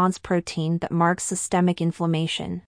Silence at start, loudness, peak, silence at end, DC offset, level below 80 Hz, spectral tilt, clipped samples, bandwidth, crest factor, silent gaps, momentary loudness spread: 0 s; -24 LUFS; -8 dBFS; 0.05 s; under 0.1%; -54 dBFS; -5 dB/octave; under 0.1%; 10.5 kHz; 14 dB; none; 4 LU